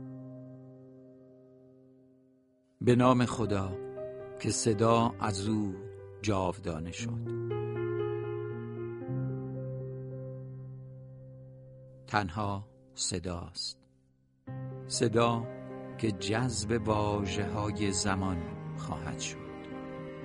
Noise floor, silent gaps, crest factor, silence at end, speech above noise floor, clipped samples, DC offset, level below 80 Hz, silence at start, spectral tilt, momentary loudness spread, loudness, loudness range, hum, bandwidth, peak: -68 dBFS; none; 24 dB; 0 s; 38 dB; under 0.1%; under 0.1%; -58 dBFS; 0 s; -5 dB/octave; 20 LU; -33 LUFS; 9 LU; none; 11.5 kHz; -10 dBFS